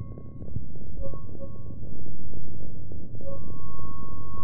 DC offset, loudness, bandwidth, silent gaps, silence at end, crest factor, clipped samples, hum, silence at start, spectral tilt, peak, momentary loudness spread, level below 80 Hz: 10%; -41 LUFS; 2.1 kHz; none; 0 s; 8 dB; under 0.1%; none; 0 s; -13.5 dB/octave; -10 dBFS; 3 LU; -44 dBFS